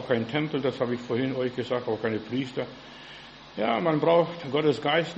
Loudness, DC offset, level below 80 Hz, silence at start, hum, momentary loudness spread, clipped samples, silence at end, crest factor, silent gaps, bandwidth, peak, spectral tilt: -27 LUFS; under 0.1%; -64 dBFS; 0 s; none; 18 LU; under 0.1%; 0 s; 18 dB; none; 8.2 kHz; -8 dBFS; -7 dB/octave